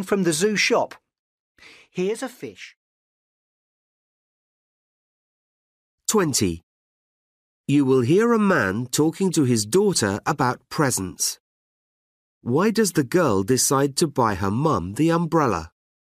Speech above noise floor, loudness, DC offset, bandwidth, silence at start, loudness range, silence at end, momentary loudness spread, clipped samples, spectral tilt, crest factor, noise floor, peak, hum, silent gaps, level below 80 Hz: over 69 dB; -21 LUFS; under 0.1%; 15.5 kHz; 0 s; 14 LU; 0.45 s; 11 LU; under 0.1%; -4.5 dB/octave; 16 dB; under -90 dBFS; -8 dBFS; none; 1.19-1.55 s, 2.77-5.98 s, 6.63-7.64 s, 11.40-12.41 s; -56 dBFS